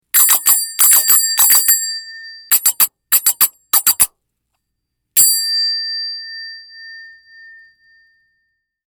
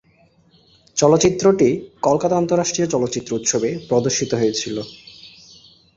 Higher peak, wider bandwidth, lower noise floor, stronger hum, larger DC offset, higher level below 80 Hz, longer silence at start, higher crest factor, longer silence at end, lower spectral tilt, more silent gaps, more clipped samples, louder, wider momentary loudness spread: about the same, 0 dBFS vs -2 dBFS; first, over 20 kHz vs 7.8 kHz; first, -74 dBFS vs -56 dBFS; neither; neither; second, -60 dBFS vs -52 dBFS; second, 0.15 s vs 0.95 s; about the same, 16 dB vs 18 dB; first, 1.8 s vs 0.7 s; second, 3.5 dB/octave vs -4.5 dB/octave; neither; neither; first, -11 LUFS vs -18 LUFS; first, 18 LU vs 12 LU